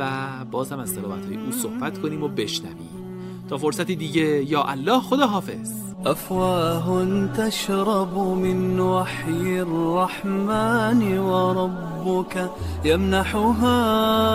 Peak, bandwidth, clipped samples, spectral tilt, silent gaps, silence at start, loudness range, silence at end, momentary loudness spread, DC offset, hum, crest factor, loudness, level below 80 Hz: -6 dBFS; 16 kHz; under 0.1%; -5.5 dB/octave; none; 0 s; 6 LU; 0 s; 10 LU; under 0.1%; none; 18 dB; -23 LUFS; -44 dBFS